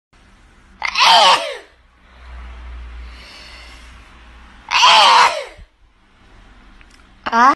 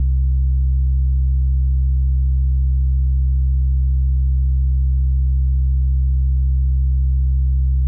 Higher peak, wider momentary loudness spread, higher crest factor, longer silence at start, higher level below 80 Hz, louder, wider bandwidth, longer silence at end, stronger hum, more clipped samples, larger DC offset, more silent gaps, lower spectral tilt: first, 0 dBFS vs -12 dBFS; first, 28 LU vs 0 LU; first, 18 dB vs 4 dB; first, 0.8 s vs 0 s; second, -42 dBFS vs -16 dBFS; first, -11 LUFS vs -19 LUFS; first, 12.5 kHz vs 0.2 kHz; about the same, 0 s vs 0 s; neither; neither; neither; neither; second, -1 dB/octave vs -16.5 dB/octave